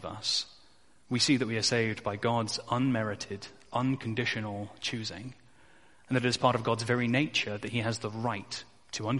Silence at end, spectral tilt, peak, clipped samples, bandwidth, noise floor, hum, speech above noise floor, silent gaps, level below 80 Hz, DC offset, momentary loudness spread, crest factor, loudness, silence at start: 0 s; -4.5 dB/octave; -10 dBFS; under 0.1%; 11.5 kHz; -63 dBFS; none; 33 dB; none; -64 dBFS; 0.1%; 12 LU; 22 dB; -30 LUFS; 0 s